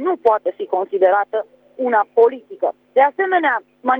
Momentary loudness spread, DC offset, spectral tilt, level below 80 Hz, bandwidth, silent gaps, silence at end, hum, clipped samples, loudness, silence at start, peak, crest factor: 8 LU; under 0.1%; -6 dB/octave; -70 dBFS; 4.1 kHz; none; 0 s; 50 Hz at -75 dBFS; under 0.1%; -18 LUFS; 0 s; -4 dBFS; 14 dB